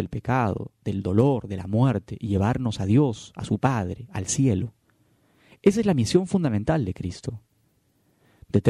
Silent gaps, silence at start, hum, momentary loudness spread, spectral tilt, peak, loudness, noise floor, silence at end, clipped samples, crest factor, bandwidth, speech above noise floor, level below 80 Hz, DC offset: none; 0 s; none; 11 LU; -6.5 dB/octave; -4 dBFS; -24 LUFS; -66 dBFS; 0 s; under 0.1%; 20 dB; 12.5 kHz; 43 dB; -50 dBFS; under 0.1%